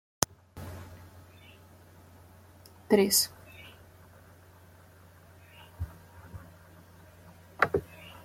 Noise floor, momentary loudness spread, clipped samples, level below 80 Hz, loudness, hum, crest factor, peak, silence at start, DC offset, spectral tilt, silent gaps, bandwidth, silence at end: -55 dBFS; 29 LU; under 0.1%; -58 dBFS; -28 LUFS; none; 36 dB; 0 dBFS; 0.55 s; under 0.1%; -3 dB/octave; none; 16.5 kHz; 0.15 s